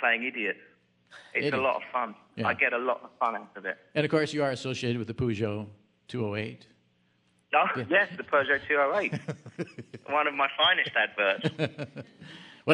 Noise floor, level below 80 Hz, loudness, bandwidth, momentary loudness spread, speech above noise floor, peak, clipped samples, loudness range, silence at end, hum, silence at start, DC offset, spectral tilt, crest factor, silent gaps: -69 dBFS; -68 dBFS; -28 LUFS; 10.5 kHz; 15 LU; 40 dB; -6 dBFS; under 0.1%; 4 LU; 0 s; none; 0 s; under 0.1%; -5.5 dB/octave; 24 dB; none